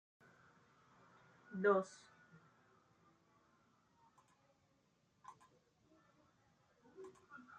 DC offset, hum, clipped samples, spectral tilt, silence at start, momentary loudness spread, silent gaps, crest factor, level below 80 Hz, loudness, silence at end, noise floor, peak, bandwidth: under 0.1%; none; under 0.1%; -6.5 dB/octave; 1.5 s; 26 LU; none; 26 dB; under -90 dBFS; -39 LUFS; 0.2 s; -78 dBFS; -22 dBFS; 9.2 kHz